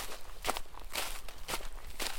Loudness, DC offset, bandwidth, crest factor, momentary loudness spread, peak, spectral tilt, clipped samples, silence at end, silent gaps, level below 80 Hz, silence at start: -40 LUFS; under 0.1%; 17 kHz; 24 dB; 7 LU; -12 dBFS; -1.5 dB/octave; under 0.1%; 0 s; none; -44 dBFS; 0 s